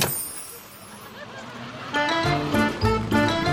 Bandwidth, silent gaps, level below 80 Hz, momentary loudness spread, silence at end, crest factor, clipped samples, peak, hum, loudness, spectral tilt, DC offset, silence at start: 17 kHz; none; -42 dBFS; 18 LU; 0 s; 18 dB; under 0.1%; -6 dBFS; none; -23 LUFS; -4.5 dB/octave; under 0.1%; 0 s